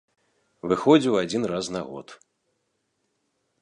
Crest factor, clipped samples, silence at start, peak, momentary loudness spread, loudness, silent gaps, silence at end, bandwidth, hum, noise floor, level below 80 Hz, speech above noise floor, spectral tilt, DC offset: 22 dB; under 0.1%; 0.65 s; -4 dBFS; 19 LU; -23 LUFS; none; 1.5 s; 11 kHz; none; -75 dBFS; -64 dBFS; 52 dB; -5.5 dB/octave; under 0.1%